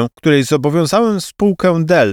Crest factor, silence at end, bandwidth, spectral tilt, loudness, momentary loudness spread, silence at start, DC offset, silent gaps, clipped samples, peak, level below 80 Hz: 12 dB; 0 s; 17 kHz; -6 dB/octave; -14 LUFS; 4 LU; 0 s; under 0.1%; none; under 0.1%; 0 dBFS; -48 dBFS